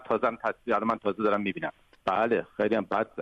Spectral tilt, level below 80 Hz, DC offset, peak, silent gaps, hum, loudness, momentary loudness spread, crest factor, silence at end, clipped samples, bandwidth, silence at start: -7.5 dB/octave; -64 dBFS; under 0.1%; -12 dBFS; none; none; -28 LUFS; 7 LU; 16 dB; 0 s; under 0.1%; 8.2 kHz; 0 s